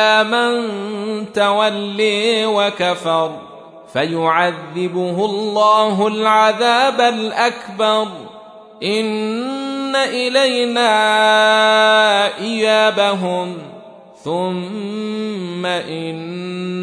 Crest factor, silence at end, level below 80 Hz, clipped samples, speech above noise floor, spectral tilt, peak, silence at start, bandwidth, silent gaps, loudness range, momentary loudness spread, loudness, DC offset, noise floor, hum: 16 dB; 0 s; -68 dBFS; under 0.1%; 23 dB; -4 dB/octave; -2 dBFS; 0 s; 11 kHz; none; 6 LU; 13 LU; -16 LUFS; under 0.1%; -39 dBFS; none